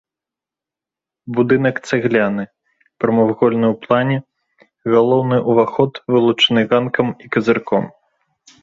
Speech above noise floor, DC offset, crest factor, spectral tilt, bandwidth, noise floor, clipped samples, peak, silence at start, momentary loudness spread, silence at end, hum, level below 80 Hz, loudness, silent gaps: 72 dB; under 0.1%; 16 dB; -6.5 dB/octave; 7.8 kHz; -87 dBFS; under 0.1%; -2 dBFS; 1.25 s; 8 LU; 0.75 s; none; -56 dBFS; -16 LUFS; none